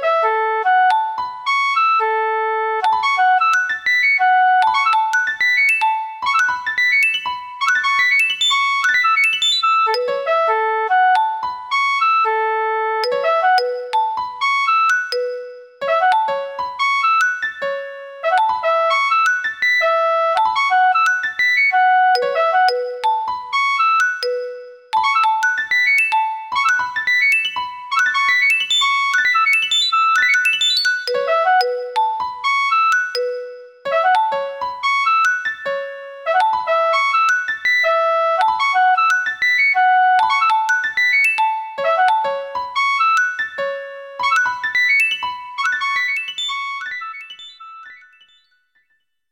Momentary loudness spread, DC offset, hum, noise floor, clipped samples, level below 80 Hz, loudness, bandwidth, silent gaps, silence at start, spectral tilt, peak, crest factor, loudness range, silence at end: 10 LU; under 0.1%; none; -67 dBFS; under 0.1%; -66 dBFS; -16 LUFS; 18 kHz; none; 0 s; 1.5 dB/octave; -2 dBFS; 14 dB; 4 LU; 1.35 s